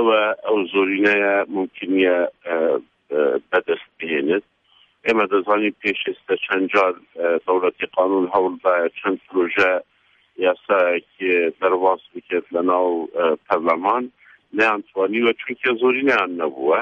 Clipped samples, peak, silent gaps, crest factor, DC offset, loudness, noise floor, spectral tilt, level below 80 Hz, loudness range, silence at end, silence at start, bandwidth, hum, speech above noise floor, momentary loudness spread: under 0.1%; -4 dBFS; none; 16 dB; under 0.1%; -20 LUFS; -58 dBFS; -5.5 dB/octave; -68 dBFS; 2 LU; 0 s; 0 s; 7.6 kHz; none; 38 dB; 7 LU